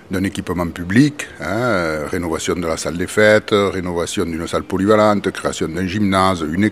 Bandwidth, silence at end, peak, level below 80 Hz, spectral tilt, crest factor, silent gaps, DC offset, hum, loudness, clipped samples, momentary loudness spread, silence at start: 16 kHz; 0 s; 0 dBFS; -46 dBFS; -5.5 dB/octave; 18 dB; none; 0.2%; none; -18 LUFS; under 0.1%; 9 LU; 0.1 s